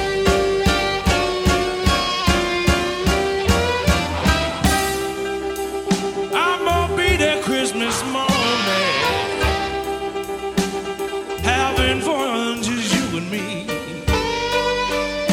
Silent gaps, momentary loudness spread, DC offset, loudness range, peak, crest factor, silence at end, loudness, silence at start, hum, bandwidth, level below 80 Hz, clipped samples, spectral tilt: none; 7 LU; under 0.1%; 3 LU; -2 dBFS; 18 dB; 0 s; -19 LUFS; 0 s; none; 18 kHz; -30 dBFS; under 0.1%; -4 dB/octave